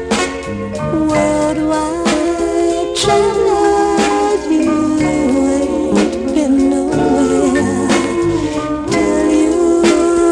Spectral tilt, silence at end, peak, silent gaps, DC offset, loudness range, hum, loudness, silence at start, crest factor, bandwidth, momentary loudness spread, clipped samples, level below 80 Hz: -5 dB/octave; 0 s; 0 dBFS; none; under 0.1%; 1 LU; none; -14 LUFS; 0 s; 14 dB; 11.5 kHz; 5 LU; under 0.1%; -36 dBFS